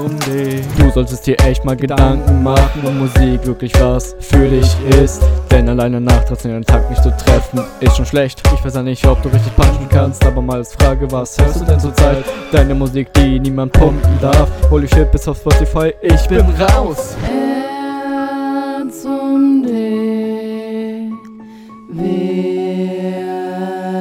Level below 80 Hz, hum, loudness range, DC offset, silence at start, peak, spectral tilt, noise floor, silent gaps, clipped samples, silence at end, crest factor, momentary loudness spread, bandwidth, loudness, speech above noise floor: -16 dBFS; none; 5 LU; under 0.1%; 0 s; 0 dBFS; -6.5 dB/octave; -34 dBFS; none; 0.3%; 0 s; 12 dB; 9 LU; 16 kHz; -14 LUFS; 23 dB